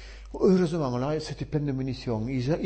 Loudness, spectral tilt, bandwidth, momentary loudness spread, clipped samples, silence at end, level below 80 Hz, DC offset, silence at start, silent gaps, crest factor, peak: -27 LUFS; -7.5 dB/octave; 8.8 kHz; 9 LU; under 0.1%; 0 s; -46 dBFS; under 0.1%; 0 s; none; 16 dB; -10 dBFS